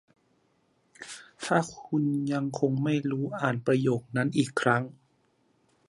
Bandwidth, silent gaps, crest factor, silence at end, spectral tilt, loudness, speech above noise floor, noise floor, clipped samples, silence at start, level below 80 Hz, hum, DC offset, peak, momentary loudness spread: 11.5 kHz; none; 22 dB; 0.95 s; -6.5 dB/octave; -28 LUFS; 42 dB; -69 dBFS; under 0.1%; 1 s; -70 dBFS; none; under 0.1%; -8 dBFS; 15 LU